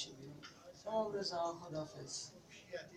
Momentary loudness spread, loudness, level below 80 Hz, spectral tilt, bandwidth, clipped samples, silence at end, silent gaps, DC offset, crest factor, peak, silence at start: 15 LU; -43 LUFS; -76 dBFS; -3.5 dB/octave; 15.5 kHz; under 0.1%; 0 s; none; under 0.1%; 18 dB; -26 dBFS; 0 s